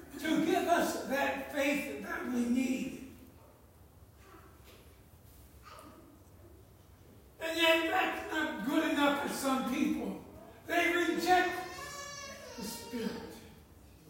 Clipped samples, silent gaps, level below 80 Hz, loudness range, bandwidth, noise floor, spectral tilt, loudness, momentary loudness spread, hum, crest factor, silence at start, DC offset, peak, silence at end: under 0.1%; none; -64 dBFS; 8 LU; 16 kHz; -59 dBFS; -3.5 dB/octave; -32 LUFS; 19 LU; none; 22 dB; 0 s; under 0.1%; -14 dBFS; 0 s